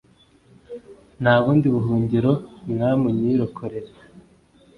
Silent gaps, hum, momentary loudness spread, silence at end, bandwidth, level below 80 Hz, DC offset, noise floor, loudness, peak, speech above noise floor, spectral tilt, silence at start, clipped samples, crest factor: none; none; 22 LU; 0.6 s; 10.5 kHz; -52 dBFS; under 0.1%; -55 dBFS; -21 LUFS; -2 dBFS; 35 dB; -9.5 dB/octave; 0.7 s; under 0.1%; 20 dB